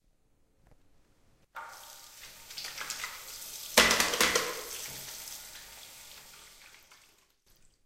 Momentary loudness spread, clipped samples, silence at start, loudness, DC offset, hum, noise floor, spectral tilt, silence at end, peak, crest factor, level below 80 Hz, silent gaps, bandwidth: 24 LU; under 0.1%; 1.55 s; -29 LUFS; under 0.1%; none; -68 dBFS; -0.5 dB/octave; 0.9 s; -2 dBFS; 34 dB; -60 dBFS; none; 16.5 kHz